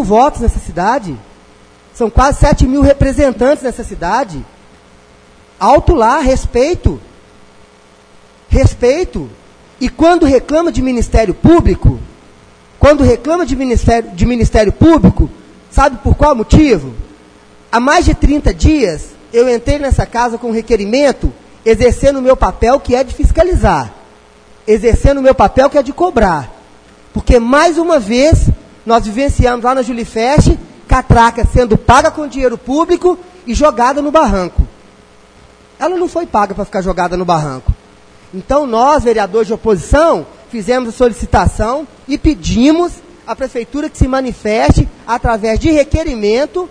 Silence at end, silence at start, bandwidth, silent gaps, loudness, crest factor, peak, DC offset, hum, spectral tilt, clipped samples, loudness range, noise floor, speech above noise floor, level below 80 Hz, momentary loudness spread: 0.05 s; 0 s; 10.5 kHz; none; -12 LUFS; 12 dB; 0 dBFS; under 0.1%; none; -6.5 dB/octave; 0.4%; 3 LU; -43 dBFS; 33 dB; -20 dBFS; 11 LU